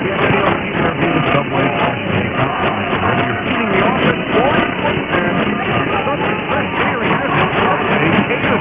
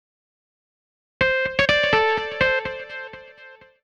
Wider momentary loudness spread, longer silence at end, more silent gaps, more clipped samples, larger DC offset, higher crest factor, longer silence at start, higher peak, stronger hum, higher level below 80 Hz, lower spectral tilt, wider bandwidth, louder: second, 3 LU vs 17 LU; second, 0 s vs 0.3 s; neither; neither; neither; about the same, 16 dB vs 18 dB; second, 0 s vs 1.2 s; first, 0 dBFS vs -6 dBFS; neither; first, -38 dBFS vs -48 dBFS; first, -9.5 dB/octave vs -4 dB/octave; second, 4 kHz vs 10 kHz; first, -15 LUFS vs -20 LUFS